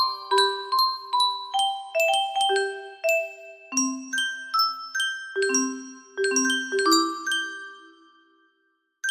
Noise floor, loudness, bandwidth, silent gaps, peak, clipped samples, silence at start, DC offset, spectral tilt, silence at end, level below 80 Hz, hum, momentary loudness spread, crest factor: -71 dBFS; -24 LUFS; 15.5 kHz; none; -6 dBFS; under 0.1%; 0 s; under 0.1%; 1 dB/octave; 0 s; -76 dBFS; none; 10 LU; 20 dB